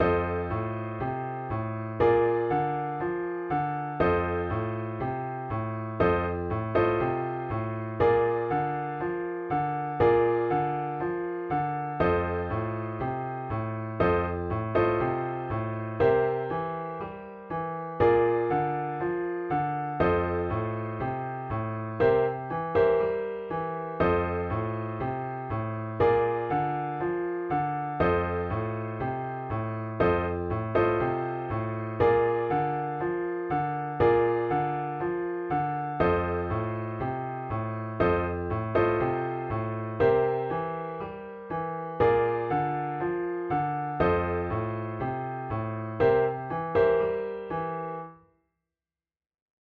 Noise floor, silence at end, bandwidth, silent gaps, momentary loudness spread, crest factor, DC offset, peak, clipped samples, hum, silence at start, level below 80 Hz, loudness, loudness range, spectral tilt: under -90 dBFS; 1.6 s; 4.8 kHz; none; 9 LU; 18 dB; under 0.1%; -10 dBFS; under 0.1%; none; 0 s; -50 dBFS; -28 LUFS; 2 LU; -10 dB/octave